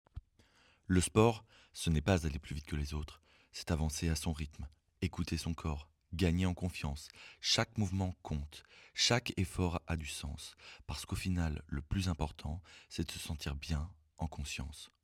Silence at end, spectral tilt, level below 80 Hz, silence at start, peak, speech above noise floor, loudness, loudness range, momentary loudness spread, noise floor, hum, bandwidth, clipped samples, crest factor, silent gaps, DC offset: 0.15 s; -5 dB/octave; -46 dBFS; 0.15 s; -14 dBFS; 32 dB; -37 LUFS; 5 LU; 16 LU; -68 dBFS; none; 16 kHz; under 0.1%; 22 dB; none; under 0.1%